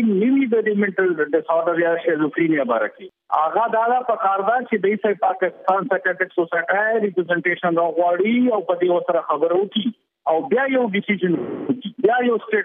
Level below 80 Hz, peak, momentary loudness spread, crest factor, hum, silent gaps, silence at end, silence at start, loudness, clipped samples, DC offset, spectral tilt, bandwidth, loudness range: -76 dBFS; -6 dBFS; 4 LU; 14 dB; none; none; 0 s; 0 s; -20 LUFS; under 0.1%; under 0.1%; -9.5 dB/octave; 3.8 kHz; 1 LU